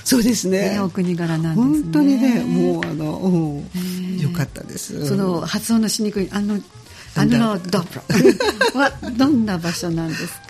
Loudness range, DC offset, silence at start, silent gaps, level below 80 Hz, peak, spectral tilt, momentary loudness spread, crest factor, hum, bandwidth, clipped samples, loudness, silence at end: 4 LU; under 0.1%; 0 s; none; -46 dBFS; 0 dBFS; -5.5 dB/octave; 10 LU; 18 dB; none; 15.5 kHz; under 0.1%; -19 LUFS; 0.05 s